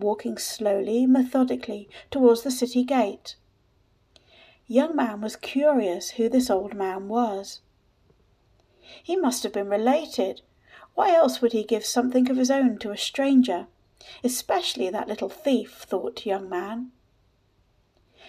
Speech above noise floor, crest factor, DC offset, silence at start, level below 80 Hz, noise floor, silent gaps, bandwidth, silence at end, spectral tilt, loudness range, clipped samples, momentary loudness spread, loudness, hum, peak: 41 dB; 20 dB; under 0.1%; 0 s; -64 dBFS; -65 dBFS; none; 15.5 kHz; 0 s; -3.5 dB/octave; 6 LU; under 0.1%; 12 LU; -24 LUFS; none; -6 dBFS